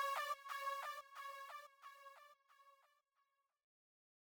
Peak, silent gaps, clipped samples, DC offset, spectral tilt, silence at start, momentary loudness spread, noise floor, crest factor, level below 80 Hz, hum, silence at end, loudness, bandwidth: -32 dBFS; none; under 0.1%; under 0.1%; 3.5 dB/octave; 0 s; 22 LU; -86 dBFS; 20 dB; under -90 dBFS; none; 1.55 s; -47 LUFS; 19.5 kHz